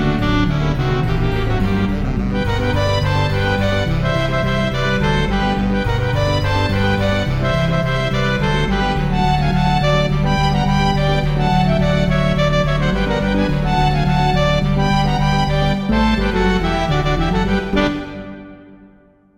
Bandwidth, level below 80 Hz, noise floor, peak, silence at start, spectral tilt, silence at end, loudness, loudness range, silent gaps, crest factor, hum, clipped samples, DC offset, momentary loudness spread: 11.5 kHz; -24 dBFS; -49 dBFS; -4 dBFS; 0 s; -6.5 dB/octave; 0.65 s; -17 LUFS; 2 LU; none; 12 dB; none; under 0.1%; under 0.1%; 2 LU